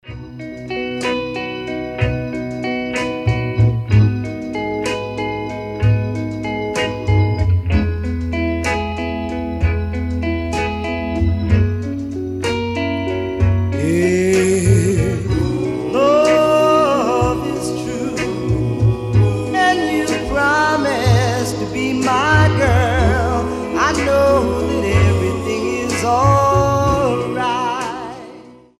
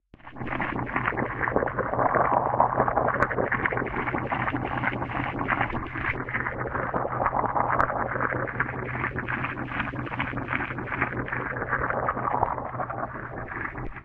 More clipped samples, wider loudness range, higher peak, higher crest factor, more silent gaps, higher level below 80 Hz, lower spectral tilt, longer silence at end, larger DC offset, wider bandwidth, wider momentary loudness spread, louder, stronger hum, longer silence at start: neither; about the same, 5 LU vs 4 LU; first, 0 dBFS vs -6 dBFS; second, 16 dB vs 22 dB; neither; first, -30 dBFS vs -44 dBFS; second, -6 dB/octave vs -8.5 dB/octave; first, 0.25 s vs 0 s; neither; first, 13.5 kHz vs 5.2 kHz; about the same, 10 LU vs 8 LU; first, -17 LUFS vs -27 LUFS; neither; second, 0.05 s vs 0.25 s